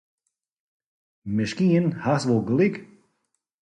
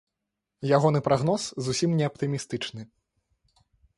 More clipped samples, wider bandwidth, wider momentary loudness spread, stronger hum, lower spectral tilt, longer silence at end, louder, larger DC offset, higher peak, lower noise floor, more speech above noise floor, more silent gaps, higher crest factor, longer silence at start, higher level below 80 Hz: neither; about the same, 10.5 kHz vs 11.5 kHz; about the same, 10 LU vs 12 LU; neither; first, -7 dB/octave vs -5.5 dB/octave; second, 0.75 s vs 1.15 s; first, -23 LUFS vs -26 LUFS; neither; about the same, -10 dBFS vs -8 dBFS; second, -76 dBFS vs -84 dBFS; second, 54 dB vs 59 dB; neither; about the same, 16 dB vs 20 dB; first, 1.25 s vs 0.6 s; about the same, -60 dBFS vs -60 dBFS